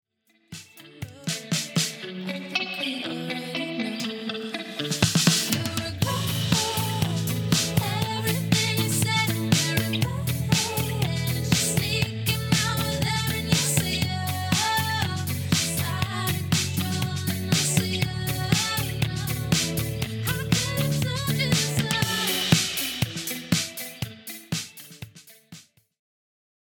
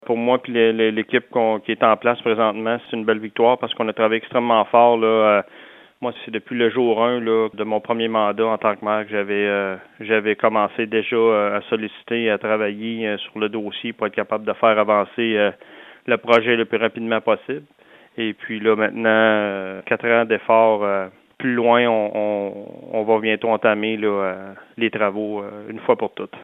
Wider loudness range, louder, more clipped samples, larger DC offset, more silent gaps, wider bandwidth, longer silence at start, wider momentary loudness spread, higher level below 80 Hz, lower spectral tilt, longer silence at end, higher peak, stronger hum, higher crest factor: about the same, 5 LU vs 3 LU; second, -25 LUFS vs -20 LUFS; neither; neither; neither; first, 19.5 kHz vs 4.3 kHz; first, 0.5 s vs 0.1 s; about the same, 10 LU vs 11 LU; first, -48 dBFS vs -72 dBFS; second, -3.5 dB/octave vs -7.5 dB/octave; first, 1.15 s vs 0 s; about the same, -2 dBFS vs 0 dBFS; neither; about the same, 24 dB vs 20 dB